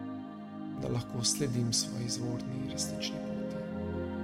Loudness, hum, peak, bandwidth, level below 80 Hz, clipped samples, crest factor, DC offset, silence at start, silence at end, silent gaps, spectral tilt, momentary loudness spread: -34 LUFS; none; -16 dBFS; 16 kHz; -60 dBFS; under 0.1%; 18 dB; under 0.1%; 0 s; 0 s; none; -4 dB/octave; 12 LU